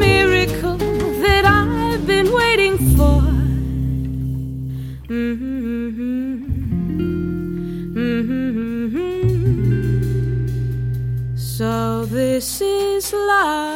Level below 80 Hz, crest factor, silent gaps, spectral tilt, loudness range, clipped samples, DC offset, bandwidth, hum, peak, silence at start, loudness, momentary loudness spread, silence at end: -26 dBFS; 16 dB; none; -6 dB/octave; 8 LU; under 0.1%; under 0.1%; 17 kHz; none; -2 dBFS; 0 s; -19 LUFS; 10 LU; 0 s